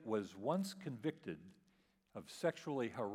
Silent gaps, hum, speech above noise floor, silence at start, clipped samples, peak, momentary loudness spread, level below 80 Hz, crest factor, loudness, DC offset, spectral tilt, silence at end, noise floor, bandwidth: none; none; 33 dB; 0 s; under 0.1%; -24 dBFS; 13 LU; -86 dBFS; 20 dB; -43 LUFS; under 0.1%; -6 dB/octave; 0 s; -76 dBFS; 16 kHz